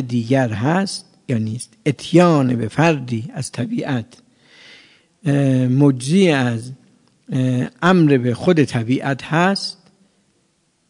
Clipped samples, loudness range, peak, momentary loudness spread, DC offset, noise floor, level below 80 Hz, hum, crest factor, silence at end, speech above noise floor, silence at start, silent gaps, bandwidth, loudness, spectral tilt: under 0.1%; 4 LU; 0 dBFS; 12 LU; under 0.1%; -63 dBFS; -60 dBFS; none; 18 dB; 1.2 s; 46 dB; 0 s; none; 11 kHz; -18 LUFS; -6.5 dB/octave